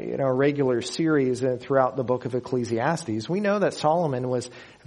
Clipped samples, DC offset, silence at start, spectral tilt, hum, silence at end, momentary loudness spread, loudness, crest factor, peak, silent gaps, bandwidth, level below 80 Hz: under 0.1%; under 0.1%; 0 s; -6 dB/octave; none; 0.15 s; 6 LU; -25 LUFS; 18 dB; -6 dBFS; none; 11 kHz; -64 dBFS